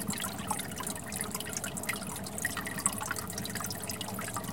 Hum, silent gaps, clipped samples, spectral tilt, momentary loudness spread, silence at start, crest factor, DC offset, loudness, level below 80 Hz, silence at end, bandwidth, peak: none; none; under 0.1%; -2.5 dB/octave; 5 LU; 0 s; 28 dB; 0.2%; -35 LUFS; -56 dBFS; 0 s; 17 kHz; -8 dBFS